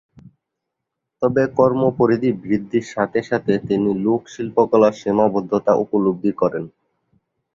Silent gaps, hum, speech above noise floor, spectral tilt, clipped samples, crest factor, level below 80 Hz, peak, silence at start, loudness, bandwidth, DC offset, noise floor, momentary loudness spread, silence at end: none; none; 62 dB; -8 dB/octave; under 0.1%; 18 dB; -56 dBFS; -2 dBFS; 1.2 s; -19 LUFS; 7.6 kHz; under 0.1%; -80 dBFS; 7 LU; 0.85 s